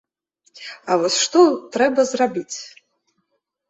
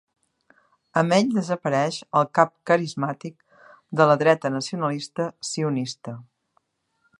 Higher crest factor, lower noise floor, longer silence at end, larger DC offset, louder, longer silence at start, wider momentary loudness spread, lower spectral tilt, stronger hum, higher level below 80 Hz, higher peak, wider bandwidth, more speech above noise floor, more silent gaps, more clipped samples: about the same, 18 dB vs 22 dB; about the same, -73 dBFS vs -70 dBFS; about the same, 1 s vs 1 s; neither; first, -18 LUFS vs -23 LUFS; second, 0.6 s vs 0.95 s; first, 21 LU vs 13 LU; second, -2.5 dB/octave vs -5.5 dB/octave; neither; about the same, -68 dBFS vs -72 dBFS; about the same, -2 dBFS vs -2 dBFS; second, 8.2 kHz vs 11.5 kHz; first, 54 dB vs 48 dB; neither; neither